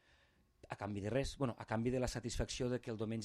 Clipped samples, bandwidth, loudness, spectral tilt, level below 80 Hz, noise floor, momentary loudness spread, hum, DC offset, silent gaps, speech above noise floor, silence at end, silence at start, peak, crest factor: under 0.1%; 13.5 kHz; -41 LUFS; -5.5 dB/octave; -54 dBFS; -72 dBFS; 6 LU; none; under 0.1%; none; 33 dB; 0 s; 0.65 s; -22 dBFS; 18 dB